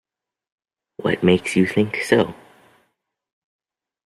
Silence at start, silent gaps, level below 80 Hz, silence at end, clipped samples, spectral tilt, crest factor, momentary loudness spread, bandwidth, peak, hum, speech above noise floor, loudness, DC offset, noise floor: 1 s; none; -58 dBFS; 1.75 s; under 0.1%; -6 dB/octave; 20 dB; 8 LU; 13.5 kHz; -2 dBFS; none; 54 dB; -19 LUFS; under 0.1%; -72 dBFS